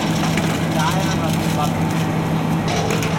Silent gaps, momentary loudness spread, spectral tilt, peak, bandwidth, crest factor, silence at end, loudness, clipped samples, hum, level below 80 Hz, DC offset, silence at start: none; 2 LU; -5.5 dB/octave; -6 dBFS; 17 kHz; 14 dB; 0 s; -19 LUFS; under 0.1%; none; -42 dBFS; under 0.1%; 0 s